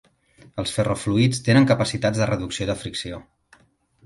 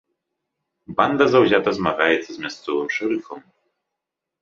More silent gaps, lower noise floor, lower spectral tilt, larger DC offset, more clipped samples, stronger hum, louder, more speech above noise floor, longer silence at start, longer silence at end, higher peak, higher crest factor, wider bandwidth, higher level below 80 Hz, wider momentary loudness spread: neither; second, -60 dBFS vs -83 dBFS; about the same, -5.5 dB/octave vs -5.5 dB/octave; neither; neither; neither; about the same, -22 LUFS vs -20 LUFS; second, 39 dB vs 64 dB; second, 0.55 s vs 0.9 s; second, 0.85 s vs 1.05 s; second, -4 dBFS vs 0 dBFS; about the same, 18 dB vs 22 dB; first, 11.5 kHz vs 7.4 kHz; first, -48 dBFS vs -58 dBFS; about the same, 14 LU vs 14 LU